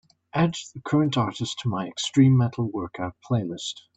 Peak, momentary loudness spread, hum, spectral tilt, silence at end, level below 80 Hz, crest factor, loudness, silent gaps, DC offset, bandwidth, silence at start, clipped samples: -6 dBFS; 13 LU; none; -6 dB/octave; 0.2 s; -62 dBFS; 18 dB; -25 LUFS; none; under 0.1%; 8.6 kHz; 0.35 s; under 0.1%